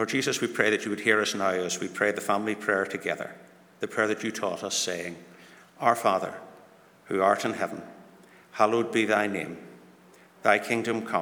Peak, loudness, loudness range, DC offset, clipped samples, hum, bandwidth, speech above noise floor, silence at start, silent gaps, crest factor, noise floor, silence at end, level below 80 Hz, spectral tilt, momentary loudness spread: -6 dBFS; -27 LUFS; 3 LU; under 0.1%; under 0.1%; none; over 20 kHz; 28 dB; 0 s; none; 24 dB; -55 dBFS; 0 s; -78 dBFS; -3.5 dB/octave; 14 LU